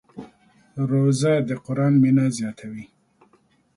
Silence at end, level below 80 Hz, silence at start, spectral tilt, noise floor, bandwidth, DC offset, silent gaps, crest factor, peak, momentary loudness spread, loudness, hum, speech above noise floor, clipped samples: 0.9 s; -64 dBFS; 0.15 s; -7 dB/octave; -61 dBFS; 11.5 kHz; under 0.1%; none; 14 dB; -8 dBFS; 22 LU; -21 LUFS; none; 41 dB; under 0.1%